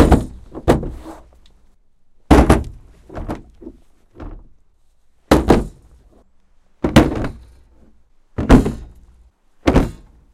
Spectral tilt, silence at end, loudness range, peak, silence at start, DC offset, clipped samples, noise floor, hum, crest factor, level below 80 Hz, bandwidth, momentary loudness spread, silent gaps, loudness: -7 dB/octave; 0.4 s; 3 LU; 0 dBFS; 0 s; under 0.1%; under 0.1%; -53 dBFS; none; 18 dB; -24 dBFS; 15.5 kHz; 23 LU; none; -16 LUFS